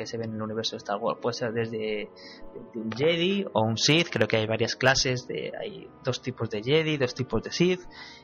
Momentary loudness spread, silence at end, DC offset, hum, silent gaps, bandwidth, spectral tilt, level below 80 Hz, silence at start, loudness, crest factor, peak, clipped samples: 14 LU; 0.05 s; under 0.1%; none; none; 13.5 kHz; -4.5 dB/octave; -52 dBFS; 0 s; -27 LUFS; 20 dB; -8 dBFS; under 0.1%